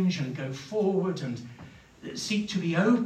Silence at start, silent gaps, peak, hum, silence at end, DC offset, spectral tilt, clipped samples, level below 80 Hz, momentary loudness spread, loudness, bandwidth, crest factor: 0 s; none; -10 dBFS; none; 0 s; under 0.1%; -6 dB/octave; under 0.1%; -66 dBFS; 19 LU; -30 LUFS; 13.5 kHz; 18 dB